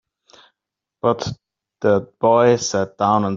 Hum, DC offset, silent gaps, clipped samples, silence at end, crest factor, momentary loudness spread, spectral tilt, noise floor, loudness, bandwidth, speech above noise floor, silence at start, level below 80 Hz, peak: none; under 0.1%; none; under 0.1%; 0 s; 18 dB; 10 LU; -5 dB/octave; -84 dBFS; -18 LUFS; 7.6 kHz; 67 dB; 1.05 s; -56 dBFS; -2 dBFS